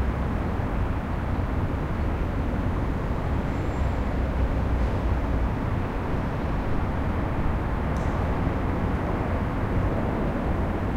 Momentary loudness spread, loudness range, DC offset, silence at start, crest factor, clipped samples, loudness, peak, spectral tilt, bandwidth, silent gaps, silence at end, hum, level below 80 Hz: 2 LU; 1 LU; under 0.1%; 0 s; 14 dB; under 0.1%; -27 LUFS; -12 dBFS; -8.5 dB/octave; 8.8 kHz; none; 0 s; none; -28 dBFS